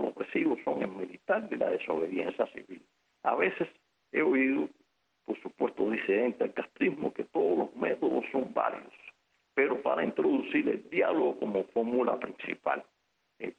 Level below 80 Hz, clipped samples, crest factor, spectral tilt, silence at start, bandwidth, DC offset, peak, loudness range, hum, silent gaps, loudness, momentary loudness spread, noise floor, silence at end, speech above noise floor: -74 dBFS; under 0.1%; 18 dB; -7.5 dB/octave; 0 s; 6.2 kHz; under 0.1%; -14 dBFS; 3 LU; none; none; -31 LUFS; 10 LU; -72 dBFS; 0.05 s; 42 dB